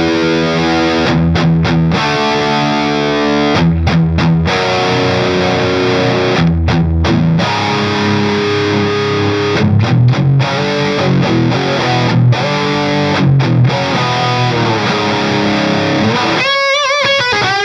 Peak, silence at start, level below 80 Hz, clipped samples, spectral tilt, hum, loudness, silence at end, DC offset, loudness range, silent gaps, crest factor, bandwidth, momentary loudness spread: 0 dBFS; 0 s; -30 dBFS; under 0.1%; -6 dB/octave; none; -12 LUFS; 0 s; under 0.1%; 1 LU; none; 12 dB; 9.6 kHz; 3 LU